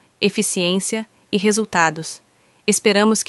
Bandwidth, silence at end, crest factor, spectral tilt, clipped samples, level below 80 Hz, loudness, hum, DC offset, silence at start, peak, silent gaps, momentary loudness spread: 12 kHz; 0.05 s; 18 dB; -3.5 dB/octave; under 0.1%; -64 dBFS; -18 LUFS; none; under 0.1%; 0.2 s; -2 dBFS; none; 13 LU